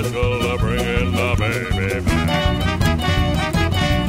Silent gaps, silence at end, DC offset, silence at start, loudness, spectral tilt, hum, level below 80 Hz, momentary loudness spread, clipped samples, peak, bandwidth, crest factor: none; 0 s; under 0.1%; 0 s; -19 LUFS; -5.5 dB/octave; none; -26 dBFS; 2 LU; under 0.1%; -4 dBFS; 16 kHz; 14 dB